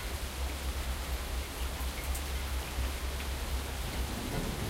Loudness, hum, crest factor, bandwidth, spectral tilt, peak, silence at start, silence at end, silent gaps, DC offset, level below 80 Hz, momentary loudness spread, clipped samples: -37 LUFS; none; 14 dB; 16 kHz; -4 dB/octave; -20 dBFS; 0 s; 0 s; none; under 0.1%; -36 dBFS; 1 LU; under 0.1%